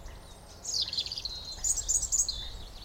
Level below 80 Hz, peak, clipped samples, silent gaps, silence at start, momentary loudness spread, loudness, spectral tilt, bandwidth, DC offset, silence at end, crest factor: -46 dBFS; -14 dBFS; under 0.1%; none; 0 s; 20 LU; -29 LUFS; 0.5 dB/octave; 17 kHz; under 0.1%; 0 s; 20 dB